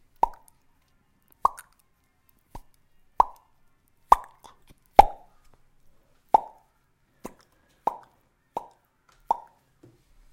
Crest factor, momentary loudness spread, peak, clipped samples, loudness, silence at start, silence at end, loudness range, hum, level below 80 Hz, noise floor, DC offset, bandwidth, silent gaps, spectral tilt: 30 dB; 28 LU; 0 dBFS; under 0.1%; -24 LUFS; 0.25 s; 1 s; 12 LU; none; -46 dBFS; -67 dBFS; under 0.1%; 16.5 kHz; none; -4.5 dB/octave